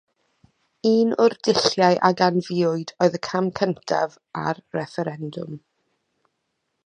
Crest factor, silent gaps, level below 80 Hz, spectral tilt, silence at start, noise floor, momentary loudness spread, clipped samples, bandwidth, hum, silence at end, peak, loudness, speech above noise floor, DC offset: 22 dB; none; -66 dBFS; -5.5 dB/octave; 0.85 s; -76 dBFS; 12 LU; under 0.1%; 9.8 kHz; none; 1.25 s; -2 dBFS; -22 LUFS; 55 dB; under 0.1%